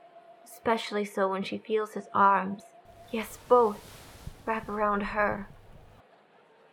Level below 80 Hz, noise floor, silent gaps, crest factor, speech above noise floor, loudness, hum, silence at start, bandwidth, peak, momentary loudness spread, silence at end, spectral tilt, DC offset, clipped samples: -54 dBFS; -60 dBFS; none; 20 dB; 32 dB; -28 LUFS; none; 0.15 s; 18.5 kHz; -10 dBFS; 19 LU; 1 s; -5.5 dB/octave; under 0.1%; under 0.1%